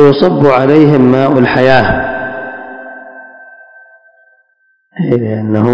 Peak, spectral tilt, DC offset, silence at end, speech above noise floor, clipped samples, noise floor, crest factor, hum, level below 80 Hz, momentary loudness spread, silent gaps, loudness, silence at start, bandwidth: 0 dBFS; -8.5 dB/octave; under 0.1%; 0 s; 49 dB; 2%; -57 dBFS; 10 dB; none; -38 dBFS; 21 LU; none; -9 LUFS; 0 s; 8 kHz